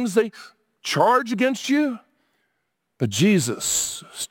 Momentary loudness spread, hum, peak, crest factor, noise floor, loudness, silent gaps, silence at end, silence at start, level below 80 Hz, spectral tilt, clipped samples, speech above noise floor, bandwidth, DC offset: 11 LU; none; -6 dBFS; 18 dB; -75 dBFS; -21 LUFS; none; 0.05 s; 0 s; -62 dBFS; -4 dB/octave; under 0.1%; 54 dB; 17 kHz; under 0.1%